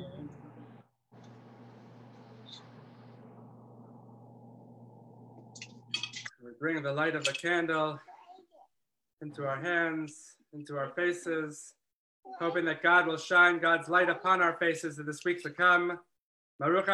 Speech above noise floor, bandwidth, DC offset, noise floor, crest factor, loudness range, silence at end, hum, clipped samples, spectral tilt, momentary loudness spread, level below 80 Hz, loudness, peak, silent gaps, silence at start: 56 dB; 12 kHz; under 0.1%; -86 dBFS; 22 dB; 13 LU; 0 s; none; under 0.1%; -4 dB/octave; 24 LU; -84 dBFS; -29 LUFS; -10 dBFS; 9.13-9.17 s, 11.93-12.23 s, 16.19-16.59 s; 0 s